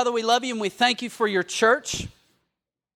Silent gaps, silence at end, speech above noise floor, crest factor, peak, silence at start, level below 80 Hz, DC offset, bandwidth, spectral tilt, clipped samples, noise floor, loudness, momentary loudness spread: none; 0.85 s; 61 dB; 18 dB; -6 dBFS; 0 s; -54 dBFS; under 0.1%; 15.5 kHz; -2.5 dB/octave; under 0.1%; -84 dBFS; -23 LUFS; 10 LU